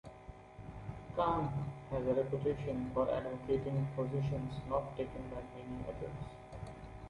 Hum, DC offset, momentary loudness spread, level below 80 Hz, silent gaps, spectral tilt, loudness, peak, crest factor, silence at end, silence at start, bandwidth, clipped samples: none; under 0.1%; 14 LU; -54 dBFS; none; -9 dB/octave; -38 LUFS; -20 dBFS; 18 dB; 0 s; 0.05 s; 10.5 kHz; under 0.1%